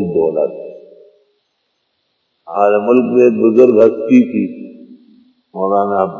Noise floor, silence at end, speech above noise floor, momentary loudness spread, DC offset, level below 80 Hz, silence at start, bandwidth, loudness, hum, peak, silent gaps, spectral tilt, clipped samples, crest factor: -67 dBFS; 0 s; 55 dB; 22 LU; under 0.1%; -60 dBFS; 0 s; 6.8 kHz; -13 LUFS; none; 0 dBFS; none; -9 dB/octave; under 0.1%; 14 dB